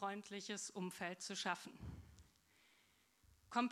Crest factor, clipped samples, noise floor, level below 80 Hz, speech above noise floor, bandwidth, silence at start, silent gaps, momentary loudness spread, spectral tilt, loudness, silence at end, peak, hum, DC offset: 24 dB; under 0.1%; -75 dBFS; -70 dBFS; 28 dB; 16 kHz; 0 s; none; 13 LU; -3.5 dB/octave; -46 LUFS; 0 s; -24 dBFS; none; under 0.1%